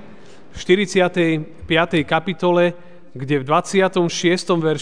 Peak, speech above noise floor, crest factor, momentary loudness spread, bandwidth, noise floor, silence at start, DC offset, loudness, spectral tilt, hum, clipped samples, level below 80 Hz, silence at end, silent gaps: 0 dBFS; 26 dB; 18 dB; 6 LU; 10 kHz; -44 dBFS; 0.1 s; 1%; -18 LUFS; -5 dB/octave; none; under 0.1%; -50 dBFS; 0 s; none